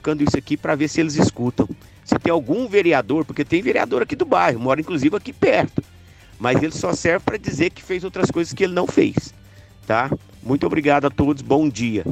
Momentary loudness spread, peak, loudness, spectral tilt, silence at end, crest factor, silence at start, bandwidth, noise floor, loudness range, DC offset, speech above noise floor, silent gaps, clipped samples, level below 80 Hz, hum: 8 LU; -2 dBFS; -20 LUFS; -6 dB/octave; 0 s; 16 dB; 0.05 s; 13.5 kHz; -45 dBFS; 3 LU; under 0.1%; 26 dB; none; under 0.1%; -46 dBFS; none